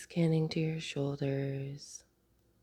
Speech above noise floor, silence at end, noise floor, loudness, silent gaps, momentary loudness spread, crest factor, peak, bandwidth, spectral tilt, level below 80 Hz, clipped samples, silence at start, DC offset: 37 dB; 0.65 s; -71 dBFS; -34 LUFS; none; 16 LU; 16 dB; -20 dBFS; 10.5 kHz; -6.5 dB/octave; -68 dBFS; under 0.1%; 0 s; under 0.1%